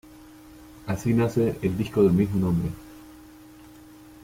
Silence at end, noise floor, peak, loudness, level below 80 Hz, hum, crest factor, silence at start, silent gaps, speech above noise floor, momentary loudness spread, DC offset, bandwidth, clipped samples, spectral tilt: 1.1 s; -48 dBFS; -10 dBFS; -24 LUFS; -50 dBFS; none; 16 dB; 0.5 s; none; 25 dB; 21 LU; under 0.1%; 16.5 kHz; under 0.1%; -8 dB/octave